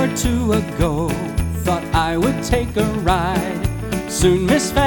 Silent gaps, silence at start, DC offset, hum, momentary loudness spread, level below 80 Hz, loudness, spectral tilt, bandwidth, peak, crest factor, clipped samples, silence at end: none; 0 s; under 0.1%; none; 6 LU; -28 dBFS; -19 LUFS; -5.5 dB/octave; 19 kHz; -2 dBFS; 16 dB; under 0.1%; 0 s